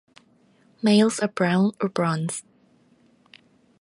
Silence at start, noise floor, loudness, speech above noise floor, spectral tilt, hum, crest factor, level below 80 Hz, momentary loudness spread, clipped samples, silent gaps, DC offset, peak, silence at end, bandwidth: 0.85 s; -60 dBFS; -23 LUFS; 38 dB; -5.5 dB/octave; none; 18 dB; -68 dBFS; 10 LU; under 0.1%; none; under 0.1%; -8 dBFS; 1.4 s; 11.5 kHz